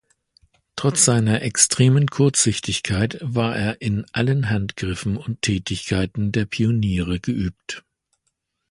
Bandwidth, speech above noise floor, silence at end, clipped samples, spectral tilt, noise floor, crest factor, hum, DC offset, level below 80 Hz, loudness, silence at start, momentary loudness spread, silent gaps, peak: 11.5 kHz; 54 dB; 0.9 s; under 0.1%; -4.5 dB/octave; -74 dBFS; 22 dB; none; under 0.1%; -42 dBFS; -20 LUFS; 0.75 s; 10 LU; none; 0 dBFS